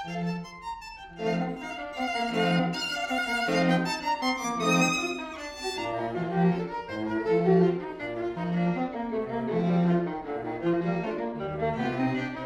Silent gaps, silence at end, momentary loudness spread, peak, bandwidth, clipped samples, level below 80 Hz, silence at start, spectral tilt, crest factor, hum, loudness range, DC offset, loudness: none; 0 s; 10 LU; -12 dBFS; 13.5 kHz; under 0.1%; -56 dBFS; 0 s; -5.5 dB/octave; 16 dB; none; 3 LU; under 0.1%; -28 LUFS